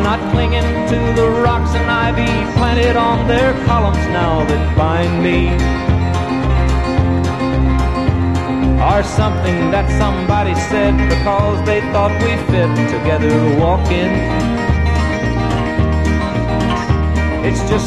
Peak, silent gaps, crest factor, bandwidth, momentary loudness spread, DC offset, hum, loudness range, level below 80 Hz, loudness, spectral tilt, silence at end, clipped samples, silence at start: 0 dBFS; none; 14 dB; 11.5 kHz; 3 LU; 0.6%; none; 1 LU; -20 dBFS; -15 LUFS; -7 dB/octave; 0 s; under 0.1%; 0 s